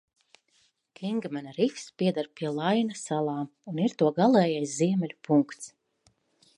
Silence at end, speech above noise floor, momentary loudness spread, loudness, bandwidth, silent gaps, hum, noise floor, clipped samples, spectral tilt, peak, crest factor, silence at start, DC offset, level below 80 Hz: 0.9 s; 42 dB; 13 LU; -28 LUFS; 11.5 kHz; none; none; -69 dBFS; under 0.1%; -6 dB/octave; -10 dBFS; 18 dB; 1 s; under 0.1%; -78 dBFS